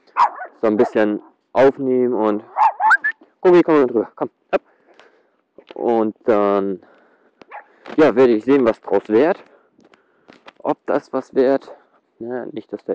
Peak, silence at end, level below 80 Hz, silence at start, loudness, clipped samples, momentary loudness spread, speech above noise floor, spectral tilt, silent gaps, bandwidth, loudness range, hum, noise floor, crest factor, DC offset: -6 dBFS; 0 s; -62 dBFS; 0.15 s; -18 LUFS; under 0.1%; 15 LU; 43 dB; -7 dB/octave; none; 8.2 kHz; 6 LU; none; -60 dBFS; 12 dB; under 0.1%